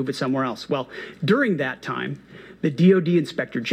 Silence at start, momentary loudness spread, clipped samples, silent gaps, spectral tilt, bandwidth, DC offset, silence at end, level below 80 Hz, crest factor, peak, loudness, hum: 0 s; 12 LU; under 0.1%; none; -7 dB/octave; 10 kHz; under 0.1%; 0 s; -64 dBFS; 16 dB; -6 dBFS; -22 LUFS; none